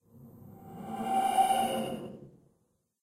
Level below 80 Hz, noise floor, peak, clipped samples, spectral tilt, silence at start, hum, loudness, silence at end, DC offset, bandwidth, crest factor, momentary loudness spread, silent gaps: -68 dBFS; -75 dBFS; -14 dBFS; under 0.1%; -4 dB/octave; 0.15 s; none; -30 LUFS; 0.75 s; under 0.1%; 16 kHz; 20 dB; 25 LU; none